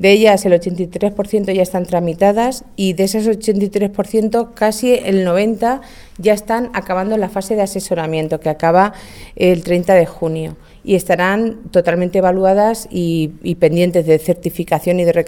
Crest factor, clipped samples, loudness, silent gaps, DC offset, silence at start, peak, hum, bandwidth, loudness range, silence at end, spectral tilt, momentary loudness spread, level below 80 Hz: 14 dB; under 0.1%; -15 LUFS; none; under 0.1%; 0 s; 0 dBFS; none; 18 kHz; 2 LU; 0 s; -6 dB/octave; 7 LU; -42 dBFS